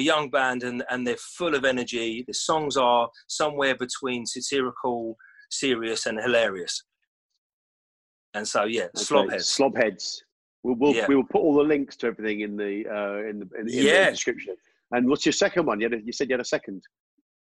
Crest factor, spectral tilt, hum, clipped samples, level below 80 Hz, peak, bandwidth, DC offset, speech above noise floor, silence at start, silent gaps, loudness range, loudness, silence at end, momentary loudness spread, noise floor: 20 dB; -3 dB/octave; none; under 0.1%; -64 dBFS; -6 dBFS; 12 kHz; under 0.1%; over 65 dB; 0 s; 7.07-7.30 s, 7.38-8.33 s, 10.32-10.63 s; 5 LU; -25 LUFS; 0.7 s; 11 LU; under -90 dBFS